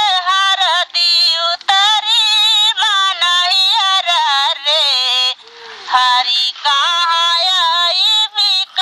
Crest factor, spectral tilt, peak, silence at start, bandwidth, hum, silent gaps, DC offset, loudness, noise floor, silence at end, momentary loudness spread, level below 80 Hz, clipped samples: 14 dB; 5 dB/octave; 0 dBFS; 0 s; 16 kHz; none; none; under 0.1%; -11 LUFS; -35 dBFS; 0 s; 4 LU; -74 dBFS; under 0.1%